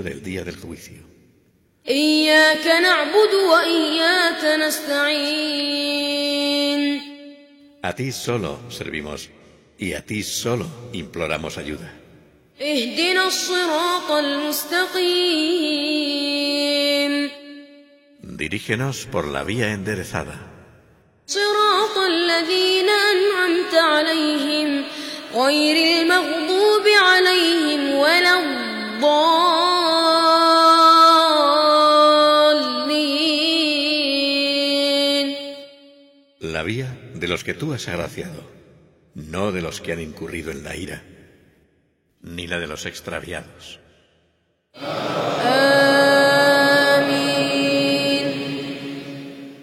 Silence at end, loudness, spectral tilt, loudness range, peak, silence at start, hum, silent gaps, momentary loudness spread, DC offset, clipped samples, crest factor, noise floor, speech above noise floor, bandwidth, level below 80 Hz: 0 s; -17 LUFS; -3.5 dB/octave; 15 LU; -2 dBFS; 0 s; none; none; 17 LU; under 0.1%; under 0.1%; 18 dB; -66 dBFS; 46 dB; 16.5 kHz; -54 dBFS